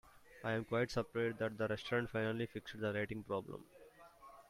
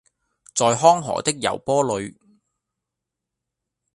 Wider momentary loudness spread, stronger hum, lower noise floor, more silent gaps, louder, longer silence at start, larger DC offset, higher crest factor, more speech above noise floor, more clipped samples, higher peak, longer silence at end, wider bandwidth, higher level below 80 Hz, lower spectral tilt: first, 15 LU vs 12 LU; neither; second, -61 dBFS vs -84 dBFS; neither; second, -40 LUFS vs -20 LUFS; second, 0.05 s vs 0.55 s; neither; second, 16 dB vs 22 dB; second, 21 dB vs 64 dB; neither; second, -24 dBFS vs 0 dBFS; second, 0.1 s vs 1.85 s; first, 16 kHz vs 11.5 kHz; second, -68 dBFS vs -60 dBFS; first, -6.5 dB/octave vs -3.5 dB/octave